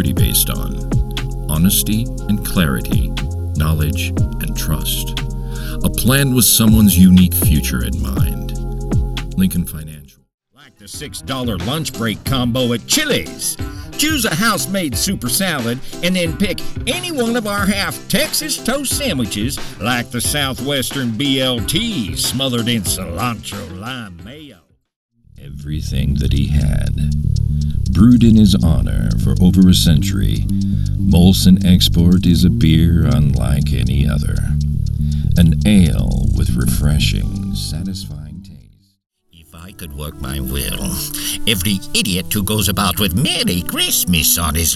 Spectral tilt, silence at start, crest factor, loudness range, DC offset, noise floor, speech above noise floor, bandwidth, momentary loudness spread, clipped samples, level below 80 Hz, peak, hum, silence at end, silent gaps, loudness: -4.5 dB/octave; 0 s; 16 dB; 10 LU; under 0.1%; -46 dBFS; 31 dB; 17 kHz; 14 LU; under 0.1%; -24 dBFS; 0 dBFS; none; 0 s; 10.34-10.38 s, 24.96-25.09 s, 39.06-39.10 s; -16 LUFS